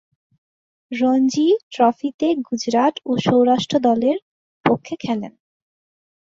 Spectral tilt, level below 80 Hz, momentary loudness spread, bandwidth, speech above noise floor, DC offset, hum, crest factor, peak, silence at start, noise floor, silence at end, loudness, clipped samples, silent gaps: -5.5 dB/octave; -62 dBFS; 9 LU; 7.8 kHz; over 72 dB; under 0.1%; none; 18 dB; -2 dBFS; 0.9 s; under -90 dBFS; 0.9 s; -19 LUFS; under 0.1%; 1.63-1.71 s, 2.14-2.19 s, 4.22-4.64 s